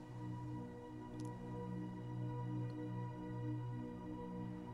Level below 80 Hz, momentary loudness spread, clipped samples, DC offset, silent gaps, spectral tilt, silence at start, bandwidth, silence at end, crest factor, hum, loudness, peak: -64 dBFS; 4 LU; under 0.1%; under 0.1%; none; -8.5 dB/octave; 0 s; 11 kHz; 0 s; 12 dB; 60 Hz at -55 dBFS; -47 LUFS; -34 dBFS